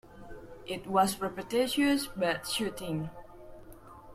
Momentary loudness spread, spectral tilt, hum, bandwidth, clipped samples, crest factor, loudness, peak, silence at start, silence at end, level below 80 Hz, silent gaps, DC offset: 24 LU; -4 dB/octave; none; 15.5 kHz; under 0.1%; 20 dB; -31 LUFS; -12 dBFS; 0.05 s; 0 s; -56 dBFS; none; under 0.1%